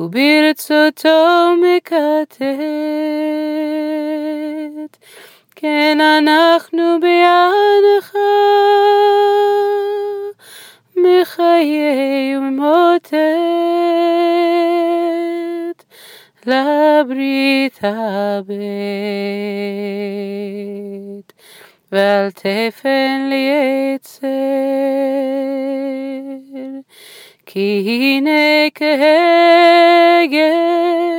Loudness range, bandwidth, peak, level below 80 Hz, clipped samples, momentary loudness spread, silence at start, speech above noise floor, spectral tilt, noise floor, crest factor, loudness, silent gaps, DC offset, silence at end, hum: 9 LU; 17 kHz; -2 dBFS; -76 dBFS; under 0.1%; 14 LU; 0 s; 30 dB; -5 dB/octave; -44 dBFS; 12 dB; -14 LUFS; none; under 0.1%; 0 s; none